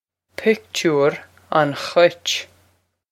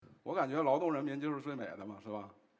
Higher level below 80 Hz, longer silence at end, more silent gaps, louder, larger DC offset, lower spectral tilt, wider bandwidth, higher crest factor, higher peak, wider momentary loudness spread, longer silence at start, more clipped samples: first, -68 dBFS vs -80 dBFS; first, 0.65 s vs 0.25 s; neither; first, -19 LUFS vs -37 LUFS; neither; second, -4 dB/octave vs -7.5 dB/octave; first, 15.5 kHz vs 8 kHz; about the same, 20 dB vs 18 dB; first, 0 dBFS vs -18 dBFS; second, 8 LU vs 13 LU; first, 0.4 s vs 0.1 s; neither